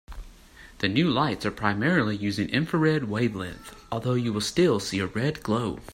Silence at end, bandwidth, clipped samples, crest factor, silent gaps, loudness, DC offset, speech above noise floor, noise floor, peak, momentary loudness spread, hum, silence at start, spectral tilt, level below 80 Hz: 0 s; 16 kHz; under 0.1%; 18 dB; none; -26 LUFS; under 0.1%; 24 dB; -49 dBFS; -8 dBFS; 11 LU; none; 0.1 s; -5.5 dB/octave; -50 dBFS